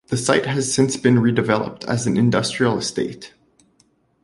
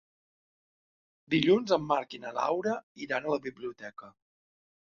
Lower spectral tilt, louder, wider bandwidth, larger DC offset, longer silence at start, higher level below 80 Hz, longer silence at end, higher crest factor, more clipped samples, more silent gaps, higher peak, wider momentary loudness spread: about the same, -5 dB/octave vs -5.5 dB/octave; first, -19 LUFS vs -30 LUFS; first, 11.5 kHz vs 7.2 kHz; neither; second, 0.1 s vs 1.3 s; first, -54 dBFS vs -70 dBFS; first, 0.95 s vs 0.75 s; about the same, 18 dB vs 22 dB; neither; second, none vs 2.83-2.95 s; first, -2 dBFS vs -10 dBFS; second, 8 LU vs 16 LU